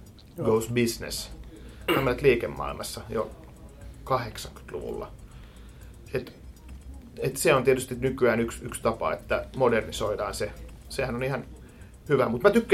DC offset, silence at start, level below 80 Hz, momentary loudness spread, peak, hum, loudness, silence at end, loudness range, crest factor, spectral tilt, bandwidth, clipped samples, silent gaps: under 0.1%; 0 s; -46 dBFS; 24 LU; -4 dBFS; none; -27 LUFS; 0 s; 10 LU; 24 dB; -5 dB/octave; 16.5 kHz; under 0.1%; none